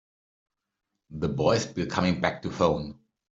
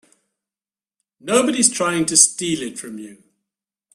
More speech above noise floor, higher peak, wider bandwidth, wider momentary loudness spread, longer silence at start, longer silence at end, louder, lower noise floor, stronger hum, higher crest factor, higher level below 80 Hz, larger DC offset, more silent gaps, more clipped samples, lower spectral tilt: second, 57 dB vs over 71 dB; second, -6 dBFS vs 0 dBFS; second, 8 kHz vs 15.5 kHz; second, 8 LU vs 21 LU; second, 1.1 s vs 1.25 s; second, 0.45 s vs 0.8 s; second, -27 LUFS vs -16 LUFS; second, -83 dBFS vs under -90 dBFS; neither; about the same, 22 dB vs 22 dB; first, -54 dBFS vs -64 dBFS; neither; neither; neither; first, -5.5 dB/octave vs -2 dB/octave